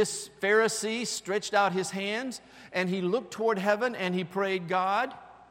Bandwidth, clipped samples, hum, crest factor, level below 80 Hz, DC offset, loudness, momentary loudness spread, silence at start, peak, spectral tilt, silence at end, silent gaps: 16.5 kHz; under 0.1%; none; 18 dB; -72 dBFS; under 0.1%; -29 LUFS; 8 LU; 0 s; -10 dBFS; -3.5 dB/octave; 0.05 s; none